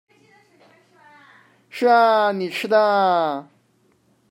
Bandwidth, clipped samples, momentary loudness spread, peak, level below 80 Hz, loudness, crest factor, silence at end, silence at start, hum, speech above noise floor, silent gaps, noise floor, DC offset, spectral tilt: 16 kHz; under 0.1%; 11 LU; -4 dBFS; -82 dBFS; -18 LUFS; 18 dB; 0.9 s; 1.75 s; none; 44 dB; none; -62 dBFS; under 0.1%; -5 dB/octave